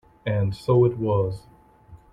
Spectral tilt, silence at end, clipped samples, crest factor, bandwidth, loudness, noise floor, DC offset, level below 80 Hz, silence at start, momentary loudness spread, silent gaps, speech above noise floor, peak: -9 dB/octave; 0.15 s; under 0.1%; 16 dB; 11 kHz; -23 LUFS; -50 dBFS; under 0.1%; -50 dBFS; 0.25 s; 9 LU; none; 28 dB; -8 dBFS